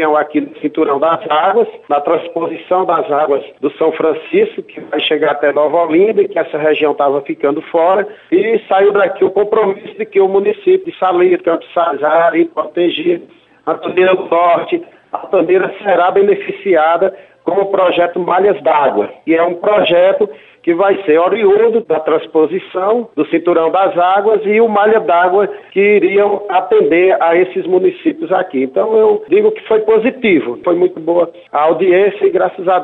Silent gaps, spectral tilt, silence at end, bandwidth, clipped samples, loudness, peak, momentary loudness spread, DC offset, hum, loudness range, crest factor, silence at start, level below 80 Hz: none; -8 dB/octave; 0 s; 4.1 kHz; under 0.1%; -13 LUFS; -2 dBFS; 6 LU; under 0.1%; none; 3 LU; 10 dB; 0 s; -60 dBFS